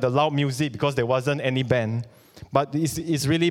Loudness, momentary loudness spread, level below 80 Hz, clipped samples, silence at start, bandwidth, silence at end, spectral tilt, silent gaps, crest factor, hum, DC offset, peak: -24 LUFS; 4 LU; -54 dBFS; under 0.1%; 0 s; 17 kHz; 0 s; -5.5 dB/octave; none; 20 dB; none; under 0.1%; -4 dBFS